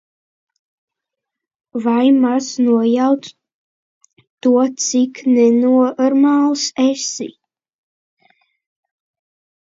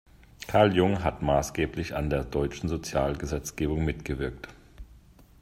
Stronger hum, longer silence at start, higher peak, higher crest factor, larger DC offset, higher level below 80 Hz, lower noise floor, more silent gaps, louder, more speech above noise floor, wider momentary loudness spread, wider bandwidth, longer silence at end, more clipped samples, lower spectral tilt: neither; first, 1.75 s vs 0.4 s; first, -2 dBFS vs -8 dBFS; second, 14 dB vs 22 dB; neither; second, -72 dBFS vs -42 dBFS; first, -82 dBFS vs -54 dBFS; first, 3.54-4.01 s, 4.30-4.38 s vs none; first, -15 LUFS vs -28 LUFS; first, 68 dB vs 27 dB; about the same, 9 LU vs 11 LU; second, 7.8 kHz vs 16 kHz; first, 2.3 s vs 0.45 s; neither; second, -3.5 dB/octave vs -6 dB/octave